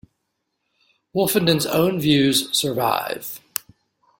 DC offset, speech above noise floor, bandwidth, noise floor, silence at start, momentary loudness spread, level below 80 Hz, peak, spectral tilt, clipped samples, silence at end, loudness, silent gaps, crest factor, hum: under 0.1%; 56 dB; 17 kHz; -76 dBFS; 1.15 s; 13 LU; -58 dBFS; 0 dBFS; -4 dB/octave; under 0.1%; 0.8 s; -20 LUFS; none; 22 dB; none